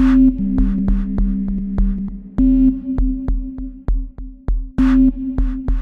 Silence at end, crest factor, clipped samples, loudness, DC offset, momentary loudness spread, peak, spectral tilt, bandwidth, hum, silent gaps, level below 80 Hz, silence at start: 0 s; 12 dB; under 0.1%; -18 LUFS; under 0.1%; 13 LU; -4 dBFS; -10 dB/octave; 4.1 kHz; none; none; -20 dBFS; 0 s